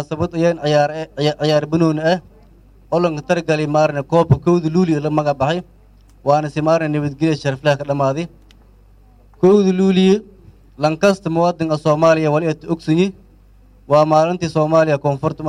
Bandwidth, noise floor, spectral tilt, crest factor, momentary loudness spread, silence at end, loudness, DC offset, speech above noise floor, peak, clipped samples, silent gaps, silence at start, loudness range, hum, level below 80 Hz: 11 kHz; -47 dBFS; -7 dB/octave; 14 dB; 7 LU; 0 s; -17 LUFS; under 0.1%; 31 dB; -2 dBFS; under 0.1%; none; 0 s; 2 LU; none; -46 dBFS